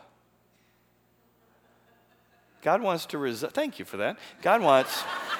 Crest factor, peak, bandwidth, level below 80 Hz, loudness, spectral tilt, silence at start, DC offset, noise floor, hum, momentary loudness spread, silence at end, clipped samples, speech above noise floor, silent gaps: 24 dB; -6 dBFS; 20 kHz; -78 dBFS; -27 LUFS; -4 dB/octave; 2.65 s; under 0.1%; -66 dBFS; 60 Hz at -60 dBFS; 11 LU; 0 s; under 0.1%; 40 dB; none